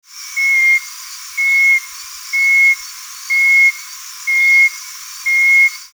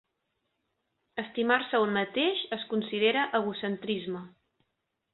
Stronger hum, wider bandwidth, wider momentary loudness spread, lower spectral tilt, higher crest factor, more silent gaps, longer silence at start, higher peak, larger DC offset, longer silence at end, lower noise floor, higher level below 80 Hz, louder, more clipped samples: neither; first, over 20 kHz vs 4.3 kHz; first, 19 LU vs 12 LU; second, 9.5 dB/octave vs -8.5 dB/octave; second, 10 dB vs 20 dB; neither; second, 0.15 s vs 1.15 s; first, -4 dBFS vs -10 dBFS; neither; second, 0.1 s vs 0.85 s; second, -31 dBFS vs -81 dBFS; first, -68 dBFS vs -74 dBFS; first, -11 LUFS vs -29 LUFS; neither